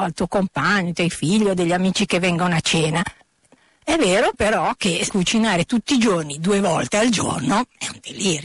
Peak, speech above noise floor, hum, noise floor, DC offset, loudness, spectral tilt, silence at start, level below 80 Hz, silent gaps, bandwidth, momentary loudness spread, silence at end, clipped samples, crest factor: -10 dBFS; 38 dB; none; -57 dBFS; under 0.1%; -19 LUFS; -4.5 dB/octave; 0 s; -48 dBFS; none; 11.5 kHz; 5 LU; 0 s; under 0.1%; 10 dB